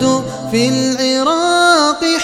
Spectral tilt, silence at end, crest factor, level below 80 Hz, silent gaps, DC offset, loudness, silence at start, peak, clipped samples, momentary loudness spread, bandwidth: -3.5 dB/octave; 0 s; 12 dB; -50 dBFS; none; under 0.1%; -13 LUFS; 0 s; 0 dBFS; under 0.1%; 6 LU; 15 kHz